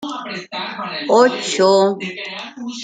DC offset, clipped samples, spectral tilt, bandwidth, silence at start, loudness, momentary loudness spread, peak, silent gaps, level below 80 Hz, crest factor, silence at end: under 0.1%; under 0.1%; -3.5 dB/octave; 9.4 kHz; 0 s; -17 LUFS; 14 LU; -2 dBFS; none; -70 dBFS; 16 dB; 0 s